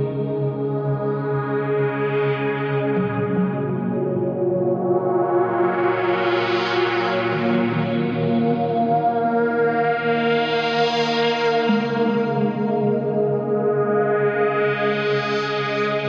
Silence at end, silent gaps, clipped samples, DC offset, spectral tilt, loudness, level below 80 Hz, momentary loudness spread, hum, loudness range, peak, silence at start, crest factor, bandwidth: 0 s; none; under 0.1%; under 0.1%; -7.5 dB/octave; -21 LUFS; -62 dBFS; 4 LU; none; 2 LU; -6 dBFS; 0 s; 14 dB; 7.4 kHz